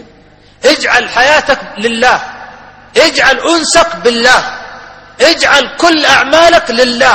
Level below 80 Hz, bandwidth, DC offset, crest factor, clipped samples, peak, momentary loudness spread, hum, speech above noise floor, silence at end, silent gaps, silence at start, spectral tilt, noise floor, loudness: -40 dBFS; 20 kHz; under 0.1%; 10 dB; 1%; 0 dBFS; 9 LU; none; 33 dB; 0 s; none; 0.65 s; -1.5 dB/octave; -41 dBFS; -8 LUFS